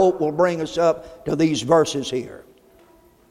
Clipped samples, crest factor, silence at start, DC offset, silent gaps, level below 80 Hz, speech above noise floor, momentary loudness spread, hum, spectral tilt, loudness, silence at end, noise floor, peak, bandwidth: under 0.1%; 18 dB; 0 s; under 0.1%; none; -54 dBFS; 33 dB; 11 LU; none; -5 dB/octave; -21 LUFS; 0.9 s; -53 dBFS; -4 dBFS; 14 kHz